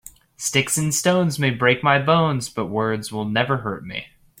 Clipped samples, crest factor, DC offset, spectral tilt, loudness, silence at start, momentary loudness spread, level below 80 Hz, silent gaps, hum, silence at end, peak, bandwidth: under 0.1%; 18 dB; under 0.1%; -4 dB/octave; -20 LUFS; 0.05 s; 11 LU; -54 dBFS; none; none; 0.35 s; -2 dBFS; 16.5 kHz